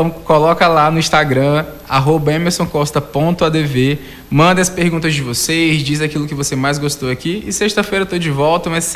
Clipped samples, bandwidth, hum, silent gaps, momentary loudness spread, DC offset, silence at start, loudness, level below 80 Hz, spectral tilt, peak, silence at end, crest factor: under 0.1%; 16 kHz; none; none; 7 LU; under 0.1%; 0 s; -14 LUFS; -40 dBFS; -4.5 dB/octave; -2 dBFS; 0 s; 14 dB